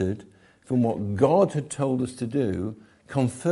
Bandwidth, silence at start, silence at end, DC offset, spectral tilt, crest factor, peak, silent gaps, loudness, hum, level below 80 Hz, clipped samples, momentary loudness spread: 11.5 kHz; 0 s; 0 s; under 0.1%; -7.5 dB/octave; 18 dB; -6 dBFS; none; -25 LUFS; none; -60 dBFS; under 0.1%; 11 LU